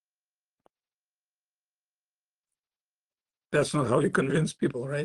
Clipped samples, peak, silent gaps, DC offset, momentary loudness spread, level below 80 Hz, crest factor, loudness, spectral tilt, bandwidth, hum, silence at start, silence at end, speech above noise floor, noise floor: under 0.1%; -12 dBFS; none; under 0.1%; 5 LU; -64 dBFS; 20 dB; -27 LUFS; -6 dB/octave; 12.5 kHz; 50 Hz at -60 dBFS; 3.5 s; 0 s; over 64 dB; under -90 dBFS